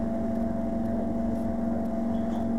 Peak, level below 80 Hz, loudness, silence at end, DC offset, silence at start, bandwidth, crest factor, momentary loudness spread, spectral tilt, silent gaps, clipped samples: -18 dBFS; -42 dBFS; -29 LUFS; 0 s; 2%; 0 s; 7.6 kHz; 12 dB; 0 LU; -9 dB/octave; none; under 0.1%